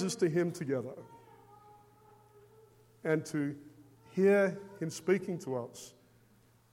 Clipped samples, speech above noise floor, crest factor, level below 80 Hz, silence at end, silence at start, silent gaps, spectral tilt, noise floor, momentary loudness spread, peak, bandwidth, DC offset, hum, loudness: under 0.1%; 33 dB; 20 dB; -78 dBFS; 0.85 s; 0 s; none; -6 dB/octave; -65 dBFS; 22 LU; -16 dBFS; 16 kHz; under 0.1%; none; -33 LUFS